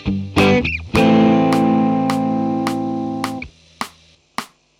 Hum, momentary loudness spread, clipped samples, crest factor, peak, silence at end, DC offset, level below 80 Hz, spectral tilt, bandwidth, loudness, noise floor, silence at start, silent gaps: none; 17 LU; under 0.1%; 16 dB; 0 dBFS; 0.35 s; under 0.1%; -40 dBFS; -6.5 dB/octave; 16 kHz; -16 LUFS; -51 dBFS; 0 s; none